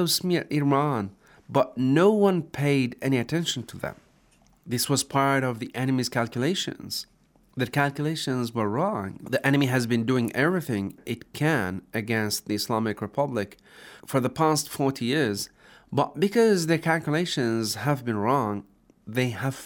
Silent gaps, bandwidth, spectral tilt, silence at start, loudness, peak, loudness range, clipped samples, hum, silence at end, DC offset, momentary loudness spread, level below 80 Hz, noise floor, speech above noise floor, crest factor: none; over 20 kHz; -5 dB/octave; 0 s; -25 LUFS; -6 dBFS; 3 LU; under 0.1%; none; 0 s; under 0.1%; 10 LU; -64 dBFS; -60 dBFS; 35 dB; 20 dB